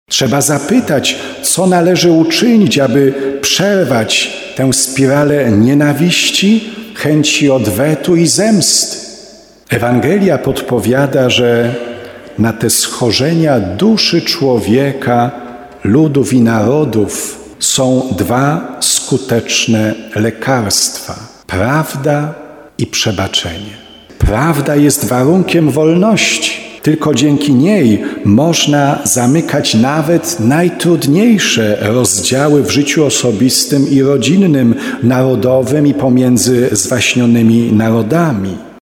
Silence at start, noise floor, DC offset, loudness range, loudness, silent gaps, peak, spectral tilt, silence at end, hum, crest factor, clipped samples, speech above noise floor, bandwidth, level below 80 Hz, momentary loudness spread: 0.1 s; -37 dBFS; under 0.1%; 3 LU; -11 LUFS; none; 0 dBFS; -4.5 dB/octave; 0.1 s; none; 10 dB; under 0.1%; 27 dB; 18 kHz; -36 dBFS; 7 LU